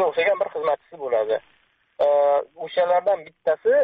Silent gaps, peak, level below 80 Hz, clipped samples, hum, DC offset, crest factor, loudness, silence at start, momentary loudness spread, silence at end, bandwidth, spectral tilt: none; -10 dBFS; -70 dBFS; under 0.1%; none; under 0.1%; 12 dB; -22 LUFS; 0 s; 7 LU; 0 s; 4.8 kHz; -1 dB/octave